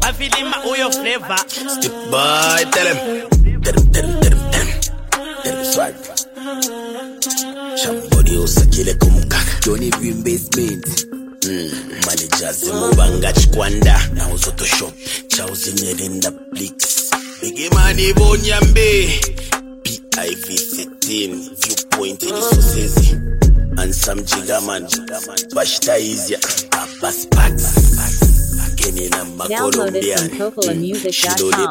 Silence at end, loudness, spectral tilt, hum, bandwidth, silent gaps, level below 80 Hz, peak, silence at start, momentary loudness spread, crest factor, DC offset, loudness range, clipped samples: 0 s; -16 LUFS; -3.5 dB/octave; none; 16.5 kHz; none; -18 dBFS; 0 dBFS; 0 s; 8 LU; 14 dB; under 0.1%; 3 LU; under 0.1%